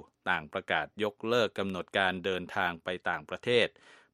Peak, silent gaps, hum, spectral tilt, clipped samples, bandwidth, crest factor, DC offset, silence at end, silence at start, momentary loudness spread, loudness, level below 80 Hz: -10 dBFS; none; none; -4.5 dB/octave; under 0.1%; 14.5 kHz; 22 dB; under 0.1%; 0.45 s; 0.25 s; 7 LU; -31 LUFS; -68 dBFS